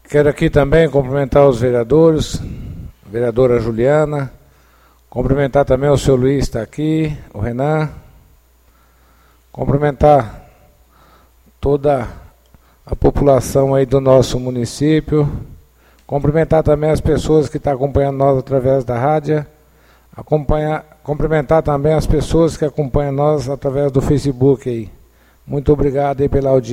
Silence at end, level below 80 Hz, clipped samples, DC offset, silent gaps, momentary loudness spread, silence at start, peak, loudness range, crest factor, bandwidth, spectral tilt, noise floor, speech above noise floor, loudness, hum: 0 s; -30 dBFS; under 0.1%; under 0.1%; none; 12 LU; 0.1 s; 0 dBFS; 4 LU; 16 dB; 15.5 kHz; -7.5 dB/octave; -51 dBFS; 37 dB; -15 LUFS; none